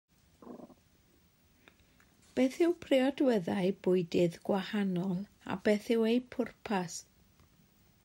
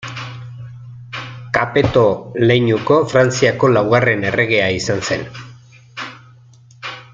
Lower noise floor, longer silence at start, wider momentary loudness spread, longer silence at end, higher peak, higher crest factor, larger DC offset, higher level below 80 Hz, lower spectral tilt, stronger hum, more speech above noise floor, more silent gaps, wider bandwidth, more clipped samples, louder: first, -67 dBFS vs -45 dBFS; first, 0.45 s vs 0 s; second, 12 LU vs 19 LU; first, 1.05 s vs 0.1 s; second, -16 dBFS vs 0 dBFS; about the same, 18 dB vs 16 dB; neither; second, -70 dBFS vs -48 dBFS; about the same, -6 dB/octave vs -5.5 dB/octave; neither; first, 36 dB vs 30 dB; neither; first, 16 kHz vs 7.8 kHz; neither; second, -32 LUFS vs -15 LUFS